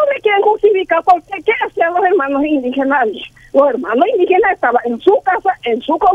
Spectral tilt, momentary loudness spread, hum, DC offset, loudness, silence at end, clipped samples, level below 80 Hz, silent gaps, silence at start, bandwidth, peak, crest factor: -5.5 dB/octave; 5 LU; none; under 0.1%; -14 LUFS; 0 s; under 0.1%; -50 dBFS; none; 0 s; 7 kHz; 0 dBFS; 12 dB